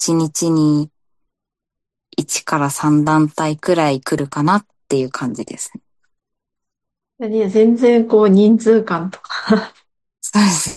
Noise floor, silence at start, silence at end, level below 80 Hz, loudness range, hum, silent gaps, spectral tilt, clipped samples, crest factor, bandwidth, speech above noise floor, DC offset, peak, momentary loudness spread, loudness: -82 dBFS; 0 s; 0 s; -58 dBFS; 7 LU; none; none; -5.5 dB/octave; under 0.1%; 16 dB; 12.5 kHz; 67 dB; under 0.1%; -2 dBFS; 14 LU; -16 LUFS